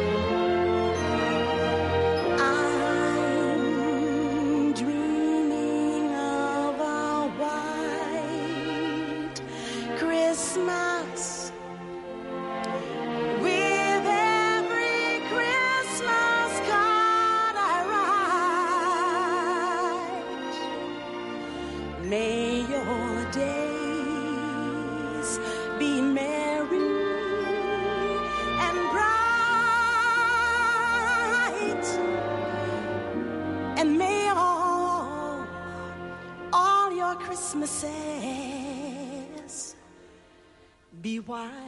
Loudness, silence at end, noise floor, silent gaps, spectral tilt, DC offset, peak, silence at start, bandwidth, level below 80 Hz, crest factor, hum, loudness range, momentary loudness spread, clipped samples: -26 LUFS; 0 s; -57 dBFS; none; -4 dB/octave; under 0.1%; -12 dBFS; 0 s; 11.5 kHz; -52 dBFS; 14 dB; none; 7 LU; 12 LU; under 0.1%